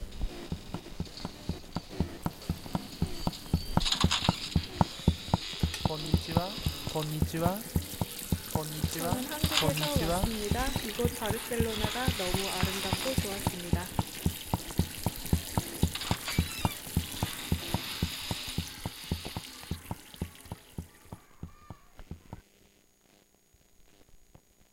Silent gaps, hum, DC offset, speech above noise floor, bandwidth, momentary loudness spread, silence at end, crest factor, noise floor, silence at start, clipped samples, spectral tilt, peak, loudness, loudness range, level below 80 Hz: none; none; under 0.1%; 34 dB; 17 kHz; 14 LU; 0.5 s; 24 dB; -65 dBFS; 0 s; under 0.1%; -4.5 dB/octave; -8 dBFS; -32 LUFS; 12 LU; -42 dBFS